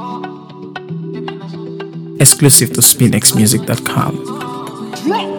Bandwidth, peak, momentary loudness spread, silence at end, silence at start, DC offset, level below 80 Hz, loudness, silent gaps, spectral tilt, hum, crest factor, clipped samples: over 20 kHz; 0 dBFS; 20 LU; 0 s; 0 s; under 0.1%; -50 dBFS; -10 LUFS; none; -3.5 dB/octave; none; 14 dB; 0.7%